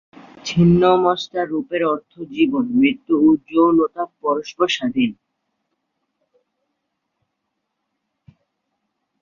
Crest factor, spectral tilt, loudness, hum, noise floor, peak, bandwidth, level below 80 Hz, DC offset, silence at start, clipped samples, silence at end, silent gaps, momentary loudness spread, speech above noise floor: 18 dB; -6.5 dB/octave; -18 LUFS; none; -76 dBFS; -2 dBFS; 7.4 kHz; -52 dBFS; under 0.1%; 0.45 s; under 0.1%; 4.1 s; none; 9 LU; 59 dB